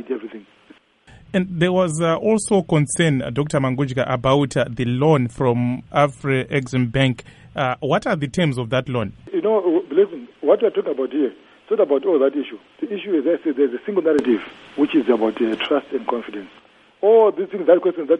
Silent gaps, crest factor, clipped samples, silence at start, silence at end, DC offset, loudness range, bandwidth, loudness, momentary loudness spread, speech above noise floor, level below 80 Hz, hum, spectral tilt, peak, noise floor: none; 18 dB; under 0.1%; 0 s; 0 s; under 0.1%; 2 LU; 11.5 kHz; -20 LUFS; 9 LU; 30 dB; -52 dBFS; none; -6 dB/octave; -2 dBFS; -49 dBFS